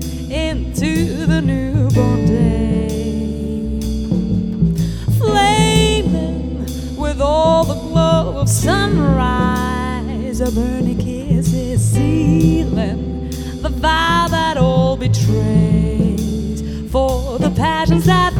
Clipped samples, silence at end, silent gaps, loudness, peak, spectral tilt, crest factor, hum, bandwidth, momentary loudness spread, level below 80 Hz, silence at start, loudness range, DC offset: under 0.1%; 0 s; none; -16 LUFS; -2 dBFS; -6 dB/octave; 14 dB; none; 17.5 kHz; 9 LU; -24 dBFS; 0 s; 2 LU; under 0.1%